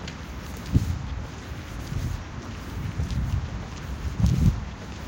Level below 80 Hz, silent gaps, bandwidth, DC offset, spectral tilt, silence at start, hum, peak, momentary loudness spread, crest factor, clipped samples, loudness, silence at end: -32 dBFS; none; 17 kHz; under 0.1%; -6.5 dB/octave; 0 s; none; -6 dBFS; 13 LU; 22 dB; under 0.1%; -30 LUFS; 0 s